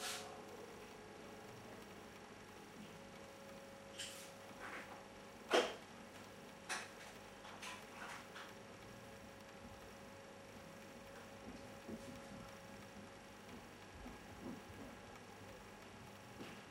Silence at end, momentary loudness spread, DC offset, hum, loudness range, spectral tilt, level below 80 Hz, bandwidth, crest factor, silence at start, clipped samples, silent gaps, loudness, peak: 0 s; 10 LU; under 0.1%; 50 Hz at -65 dBFS; 10 LU; -3 dB/octave; -72 dBFS; 16 kHz; 30 dB; 0 s; under 0.1%; none; -51 LUFS; -22 dBFS